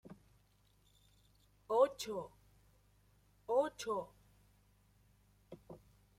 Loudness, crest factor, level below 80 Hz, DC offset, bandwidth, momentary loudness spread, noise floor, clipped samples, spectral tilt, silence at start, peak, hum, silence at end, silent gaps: -37 LUFS; 24 dB; -72 dBFS; under 0.1%; 16 kHz; 26 LU; -72 dBFS; under 0.1%; -4 dB/octave; 0.05 s; -18 dBFS; 50 Hz at -70 dBFS; 0.4 s; none